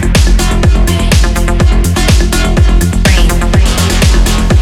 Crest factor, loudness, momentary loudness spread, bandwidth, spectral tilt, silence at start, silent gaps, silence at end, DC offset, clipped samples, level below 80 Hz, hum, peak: 8 dB; -10 LUFS; 2 LU; 16 kHz; -5 dB/octave; 0 s; none; 0 s; under 0.1%; 0.3%; -10 dBFS; none; 0 dBFS